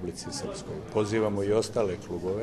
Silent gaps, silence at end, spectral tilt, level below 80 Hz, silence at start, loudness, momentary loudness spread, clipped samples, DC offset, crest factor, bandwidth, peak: none; 0 s; -5.5 dB/octave; -54 dBFS; 0 s; -30 LUFS; 9 LU; under 0.1%; under 0.1%; 18 dB; 13 kHz; -12 dBFS